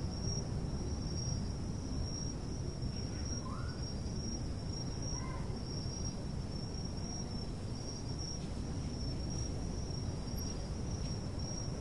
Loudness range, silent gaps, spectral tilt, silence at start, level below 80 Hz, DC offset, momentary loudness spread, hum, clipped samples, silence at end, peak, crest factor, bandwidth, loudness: 1 LU; none; -5.5 dB/octave; 0 s; -44 dBFS; 0.2%; 3 LU; none; under 0.1%; 0 s; -24 dBFS; 14 dB; 12 kHz; -40 LUFS